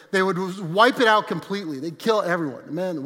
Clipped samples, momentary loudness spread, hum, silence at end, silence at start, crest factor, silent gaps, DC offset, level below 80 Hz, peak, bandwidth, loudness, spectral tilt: under 0.1%; 12 LU; none; 0 s; 0.1 s; 20 dB; none; under 0.1%; -78 dBFS; -2 dBFS; 16.5 kHz; -22 LUFS; -5 dB/octave